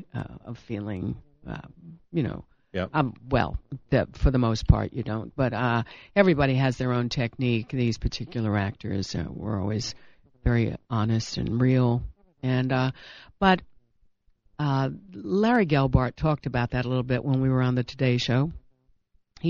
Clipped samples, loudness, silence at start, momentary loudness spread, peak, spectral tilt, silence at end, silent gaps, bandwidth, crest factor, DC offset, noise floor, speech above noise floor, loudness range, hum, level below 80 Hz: under 0.1%; -26 LUFS; 0 s; 13 LU; -2 dBFS; -7 dB/octave; 0 s; none; 7.4 kHz; 24 dB; under 0.1%; -64 dBFS; 39 dB; 5 LU; none; -38 dBFS